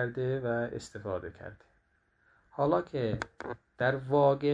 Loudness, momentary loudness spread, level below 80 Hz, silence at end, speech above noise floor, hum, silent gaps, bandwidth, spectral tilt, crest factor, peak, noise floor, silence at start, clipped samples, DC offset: -31 LUFS; 18 LU; -60 dBFS; 0 s; 40 dB; none; none; 10 kHz; -7 dB/octave; 18 dB; -12 dBFS; -71 dBFS; 0 s; under 0.1%; under 0.1%